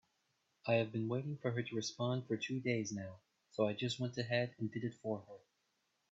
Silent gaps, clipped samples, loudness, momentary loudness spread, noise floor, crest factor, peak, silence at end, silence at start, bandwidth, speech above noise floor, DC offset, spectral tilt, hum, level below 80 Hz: none; under 0.1%; -39 LUFS; 10 LU; -82 dBFS; 20 dB; -20 dBFS; 0.75 s; 0.65 s; 8 kHz; 43 dB; under 0.1%; -5.5 dB/octave; none; -80 dBFS